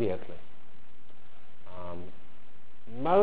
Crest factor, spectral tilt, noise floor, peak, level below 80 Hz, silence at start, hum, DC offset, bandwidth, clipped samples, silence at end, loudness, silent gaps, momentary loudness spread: 22 dB; -10 dB/octave; -60 dBFS; -14 dBFS; -60 dBFS; 0 s; none; 4%; 4 kHz; under 0.1%; 0 s; -36 LUFS; none; 25 LU